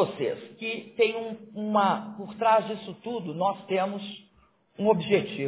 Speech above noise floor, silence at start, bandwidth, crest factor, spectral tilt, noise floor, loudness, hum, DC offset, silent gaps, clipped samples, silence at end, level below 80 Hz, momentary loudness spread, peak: 36 dB; 0 s; 4 kHz; 18 dB; -9.5 dB/octave; -63 dBFS; -28 LUFS; none; under 0.1%; none; under 0.1%; 0 s; -70 dBFS; 13 LU; -8 dBFS